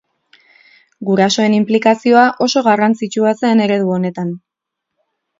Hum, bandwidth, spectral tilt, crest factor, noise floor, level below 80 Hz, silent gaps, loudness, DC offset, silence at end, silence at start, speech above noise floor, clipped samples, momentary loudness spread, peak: none; 7.8 kHz; -5.5 dB/octave; 14 dB; -79 dBFS; -64 dBFS; none; -14 LUFS; under 0.1%; 1 s; 1 s; 66 dB; under 0.1%; 11 LU; 0 dBFS